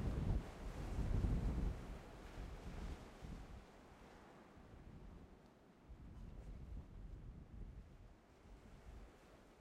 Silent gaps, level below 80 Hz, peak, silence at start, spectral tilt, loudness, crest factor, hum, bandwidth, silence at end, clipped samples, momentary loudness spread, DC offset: none; -50 dBFS; -26 dBFS; 0 s; -7.5 dB/octave; -49 LUFS; 22 dB; none; 12.5 kHz; 0 s; under 0.1%; 21 LU; under 0.1%